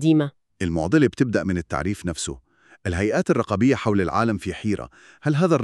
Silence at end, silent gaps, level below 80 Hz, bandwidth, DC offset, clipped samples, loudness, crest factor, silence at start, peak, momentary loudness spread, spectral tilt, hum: 0 s; none; -46 dBFS; 12 kHz; under 0.1%; under 0.1%; -23 LUFS; 18 dB; 0 s; -4 dBFS; 10 LU; -6.5 dB/octave; none